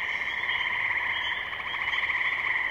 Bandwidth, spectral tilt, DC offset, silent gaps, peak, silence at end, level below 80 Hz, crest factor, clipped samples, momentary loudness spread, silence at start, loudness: 16 kHz; -2 dB/octave; under 0.1%; none; -14 dBFS; 0 s; -60 dBFS; 14 dB; under 0.1%; 4 LU; 0 s; -27 LUFS